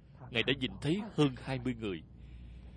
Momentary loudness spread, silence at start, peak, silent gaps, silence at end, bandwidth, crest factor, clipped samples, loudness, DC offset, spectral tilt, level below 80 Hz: 20 LU; 0 s; -12 dBFS; none; 0 s; 10 kHz; 24 dB; under 0.1%; -34 LUFS; under 0.1%; -6 dB/octave; -54 dBFS